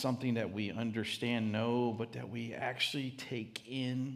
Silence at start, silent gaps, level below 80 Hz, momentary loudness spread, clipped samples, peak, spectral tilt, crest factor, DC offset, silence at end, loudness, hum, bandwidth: 0 s; none; -78 dBFS; 8 LU; under 0.1%; -18 dBFS; -5.5 dB/octave; 18 dB; under 0.1%; 0 s; -37 LUFS; none; 15 kHz